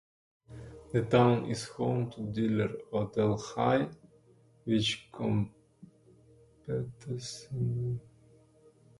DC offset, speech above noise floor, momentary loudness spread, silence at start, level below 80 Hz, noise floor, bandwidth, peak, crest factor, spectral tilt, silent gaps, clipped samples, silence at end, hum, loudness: under 0.1%; 32 dB; 13 LU; 0.5 s; -60 dBFS; -62 dBFS; 11.5 kHz; -12 dBFS; 20 dB; -6.5 dB/octave; none; under 0.1%; 1 s; none; -32 LUFS